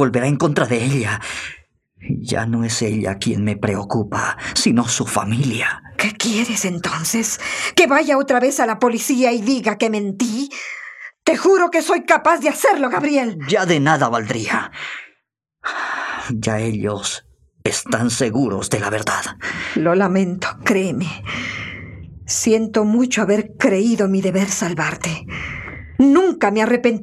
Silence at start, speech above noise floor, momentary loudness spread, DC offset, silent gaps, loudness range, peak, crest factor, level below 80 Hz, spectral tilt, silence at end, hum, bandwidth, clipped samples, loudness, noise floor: 0 s; 51 dB; 12 LU; under 0.1%; none; 5 LU; 0 dBFS; 18 dB; -52 dBFS; -4.5 dB/octave; 0 s; none; 15 kHz; under 0.1%; -18 LUFS; -68 dBFS